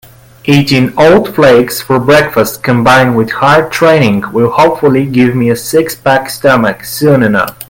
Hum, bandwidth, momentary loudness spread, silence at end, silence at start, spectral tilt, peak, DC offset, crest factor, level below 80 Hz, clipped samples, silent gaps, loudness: none; 17.5 kHz; 5 LU; 0.05 s; 0.45 s; -5.5 dB/octave; 0 dBFS; under 0.1%; 8 dB; -40 dBFS; 0.3%; none; -8 LUFS